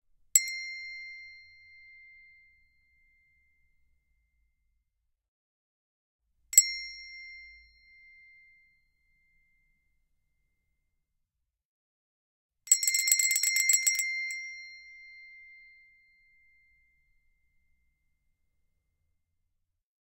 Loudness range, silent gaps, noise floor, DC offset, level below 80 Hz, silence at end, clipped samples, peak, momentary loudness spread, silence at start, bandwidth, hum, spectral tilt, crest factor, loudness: 19 LU; 5.28-6.19 s, 11.65-12.49 s; -83 dBFS; under 0.1%; -74 dBFS; 4.65 s; under 0.1%; -4 dBFS; 27 LU; 0.35 s; 16 kHz; none; 7 dB/octave; 32 dB; -25 LUFS